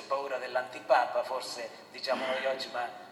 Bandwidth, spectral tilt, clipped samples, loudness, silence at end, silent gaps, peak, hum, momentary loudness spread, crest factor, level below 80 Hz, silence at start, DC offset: 13.5 kHz; -2 dB/octave; under 0.1%; -32 LUFS; 0 s; none; -12 dBFS; none; 11 LU; 20 dB; under -90 dBFS; 0 s; under 0.1%